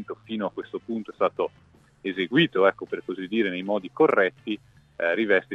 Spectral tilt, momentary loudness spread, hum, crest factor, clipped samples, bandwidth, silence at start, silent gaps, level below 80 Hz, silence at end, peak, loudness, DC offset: -7 dB/octave; 13 LU; none; 20 dB; under 0.1%; 6.8 kHz; 0 s; none; -68 dBFS; 0 s; -6 dBFS; -26 LUFS; under 0.1%